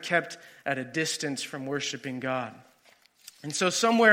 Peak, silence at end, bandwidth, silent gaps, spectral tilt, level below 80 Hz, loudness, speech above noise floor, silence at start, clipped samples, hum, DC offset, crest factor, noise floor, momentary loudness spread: -6 dBFS; 0 s; 16.5 kHz; none; -3 dB/octave; -78 dBFS; -29 LUFS; 34 dB; 0 s; under 0.1%; none; under 0.1%; 24 dB; -61 dBFS; 13 LU